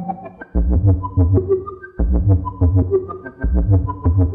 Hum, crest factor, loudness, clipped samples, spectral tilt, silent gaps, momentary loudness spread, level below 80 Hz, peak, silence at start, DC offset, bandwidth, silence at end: none; 14 dB; -18 LUFS; under 0.1%; -14.5 dB/octave; none; 10 LU; -22 dBFS; -2 dBFS; 0 s; under 0.1%; 2.4 kHz; 0 s